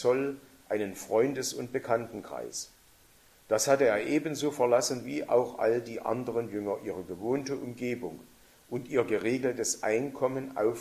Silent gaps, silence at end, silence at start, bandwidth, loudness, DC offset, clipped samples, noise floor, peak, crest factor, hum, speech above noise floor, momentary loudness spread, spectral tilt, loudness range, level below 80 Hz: none; 0 s; 0 s; 15 kHz; -30 LUFS; under 0.1%; under 0.1%; -60 dBFS; -12 dBFS; 20 dB; none; 30 dB; 12 LU; -4 dB/octave; 5 LU; -68 dBFS